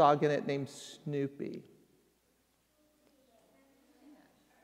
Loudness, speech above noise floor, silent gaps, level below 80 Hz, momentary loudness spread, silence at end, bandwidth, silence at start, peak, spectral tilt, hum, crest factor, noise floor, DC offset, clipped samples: -35 LUFS; 42 dB; none; -82 dBFS; 15 LU; 3.05 s; 15 kHz; 0 s; -12 dBFS; -6 dB/octave; none; 24 dB; -74 dBFS; under 0.1%; under 0.1%